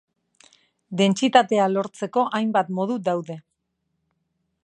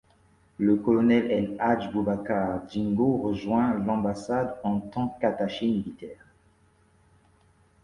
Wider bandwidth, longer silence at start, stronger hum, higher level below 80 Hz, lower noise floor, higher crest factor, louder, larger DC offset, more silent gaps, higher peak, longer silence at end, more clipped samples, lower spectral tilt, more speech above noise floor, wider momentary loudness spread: about the same, 9.8 kHz vs 10.5 kHz; first, 0.9 s vs 0.6 s; neither; second, -74 dBFS vs -56 dBFS; first, -76 dBFS vs -62 dBFS; about the same, 22 dB vs 18 dB; first, -22 LUFS vs -26 LUFS; neither; neither; first, -2 dBFS vs -10 dBFS; second, 1.25 s vs 1.7 s; neither; second, -5.5 dB/octave vs -8 dB/octave; first, 55 dB vs 37 dB; first, 13 LU vs 8 LU